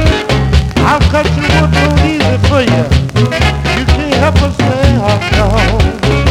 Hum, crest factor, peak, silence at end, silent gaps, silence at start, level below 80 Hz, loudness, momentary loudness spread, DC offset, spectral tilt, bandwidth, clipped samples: none; 10 dB; 0 dBFS; 0 s; none; 0 s; -16 dBFS; -11 LUFS; 2 LU; under 0.1%; -6 dB/octave; 13 kHz; 0.5%